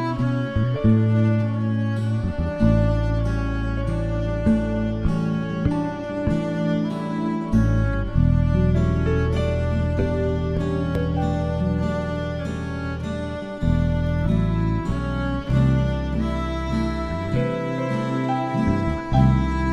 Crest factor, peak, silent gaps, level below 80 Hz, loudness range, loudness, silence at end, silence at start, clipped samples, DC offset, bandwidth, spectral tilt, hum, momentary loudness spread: 16 dB; -6 dBFS; none; -28 dBFS; 3 LU; -23 LUFS; 0 s; 0 s; under 0.1%; under 0.1%; 9.4 kHz; -8.5 dB/octave; none; 7 LU